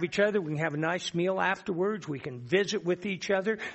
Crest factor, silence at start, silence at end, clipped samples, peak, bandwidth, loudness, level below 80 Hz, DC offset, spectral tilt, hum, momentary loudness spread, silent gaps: 18 dB; 0 s; 0 s; under 0.1%; -12 dBFS; 8.2 kHz; -30 LUFS; -68 dBFS; under 0.1%; -5 dB/octave; none; 4 LU; none